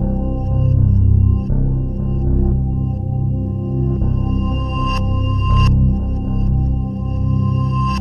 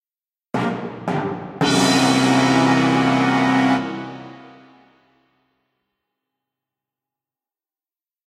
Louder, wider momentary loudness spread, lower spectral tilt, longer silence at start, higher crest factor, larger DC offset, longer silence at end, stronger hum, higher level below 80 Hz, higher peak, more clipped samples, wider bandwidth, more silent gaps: about the same, -18 LUFS vs -18 LUFS; second, 7 LU vs 13 LU; first, -9 dB/octave vs -4.5 dB/octave; second, 0 s vs 0.55 s; about the same, 14 dB vs 18 dB; neither; second, 0 s vs 3.85 s; neither; first, -20 dBFS vs -58 dBFS; about the same, -2 dBFS vs -4 dBFS; neither; second, 6.8 kHz vs 14 kHz; neither